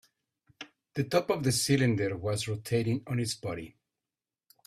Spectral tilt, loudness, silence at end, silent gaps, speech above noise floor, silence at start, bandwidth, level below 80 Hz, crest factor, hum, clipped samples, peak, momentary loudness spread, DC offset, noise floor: -5 dB/octave; -30 LUFS; 0.95 s; none; over 61 dB; 0.6 s; 15.5 kHz; -62 dBFS; 20 dB; none; under 0.1%; -12 dBFS; 20 LU; under 0.1%; under -90 dBFS